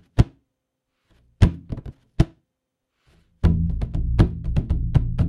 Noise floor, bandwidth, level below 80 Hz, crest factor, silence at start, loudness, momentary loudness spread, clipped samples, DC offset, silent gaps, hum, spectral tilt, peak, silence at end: -79 dBFS; 10.5 kHz; -28 dBFS; 22 dB; 0.15 s; -23 LUFS; 12 LU; under 0.1%; under 0.1%; none; none; -8.5 dB/octave; 0 dBFS; 0 s